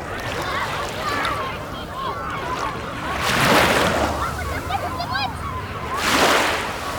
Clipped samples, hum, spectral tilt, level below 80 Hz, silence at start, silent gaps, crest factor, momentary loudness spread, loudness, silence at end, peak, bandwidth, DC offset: under 0.1%; none; -3.5 dB/octave; -38 dBFS; 0 s; none; 18 dB; 12 LU; -21 LUFS; 0 s; -4 dBFS; over 20 kHz; under 0.1%